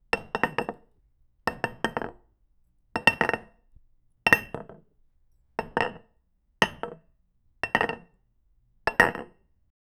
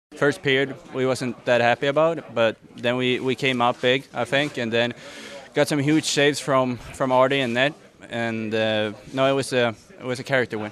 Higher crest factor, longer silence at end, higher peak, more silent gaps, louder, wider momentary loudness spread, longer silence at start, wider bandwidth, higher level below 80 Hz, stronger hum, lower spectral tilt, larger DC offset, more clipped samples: first, 30 dB vs 20 dB; first, 0.75 s vs 0 s; first, 0 dBFS vs -4 dBFS; neither; second, -27 LUFS vs -22 LUFS; first, 18 LU vs 8 LU; about the same, 0.15 s vs 0.1 s; first, over 20 kHz vs 14.5 kHz; first, -54 dBFS vs -60 dBFS; neither; about the same, -4 dB/octave vs -4.5 dB/octave; neither; neither